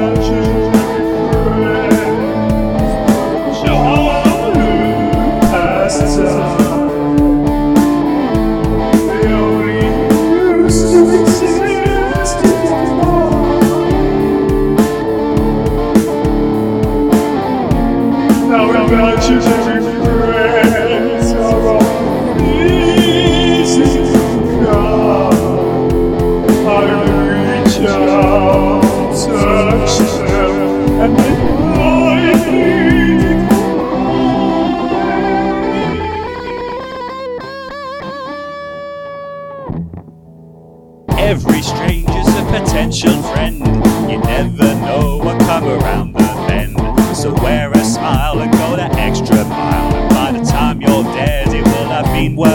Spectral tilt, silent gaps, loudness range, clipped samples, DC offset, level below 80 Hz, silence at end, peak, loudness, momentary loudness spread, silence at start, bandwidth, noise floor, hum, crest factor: -6 dB/octave; none; 6 LU; 0.3%; under 0.1%; -24 dBFS; 0 s; 0 dBFS; -12 LUFS; 5 LU; 0 s; 18.5 kHz; -38 dBFS; none; 12 dB